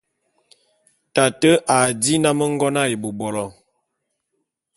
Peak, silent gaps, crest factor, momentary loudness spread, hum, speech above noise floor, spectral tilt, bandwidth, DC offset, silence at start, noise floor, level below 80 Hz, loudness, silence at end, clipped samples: -2 dBFS; none; 20 dB; 10 LU; none; 58 dB; -4 dB/octave; 12 kHz; under 0.1%; 1.15 s; -76 dBFS; -58 dBFS; -18 LUFS; 1.25 s; under 0.1%